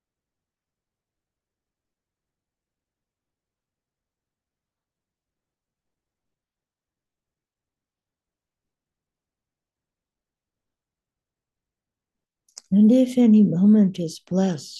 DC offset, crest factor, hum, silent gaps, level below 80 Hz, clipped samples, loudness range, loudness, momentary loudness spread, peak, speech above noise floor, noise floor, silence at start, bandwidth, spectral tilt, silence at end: under 0.1%; 18 dB; none; none; -76 dBFS; under 0.1%; 6 LU; -18 LUFS; 8 LU; -8 dBFS; over 73 dB; under -90 dBFS; 12.7 s; 11 kHz; -8 dB/octave; 0 s